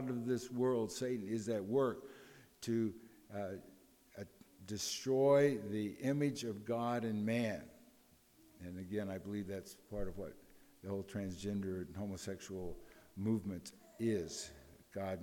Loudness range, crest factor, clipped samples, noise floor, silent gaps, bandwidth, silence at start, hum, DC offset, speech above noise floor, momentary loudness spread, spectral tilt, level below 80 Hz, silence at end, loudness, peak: 9 LU; 20 dB; under 0.1%; -68 dBFS; none; 19 kHz; 0 s; none; under 0.1%; 30 dB; 17 LU; -5.5 dB/octave; -64 dBFS; 0 s; -39 LUFS; -20 dBFS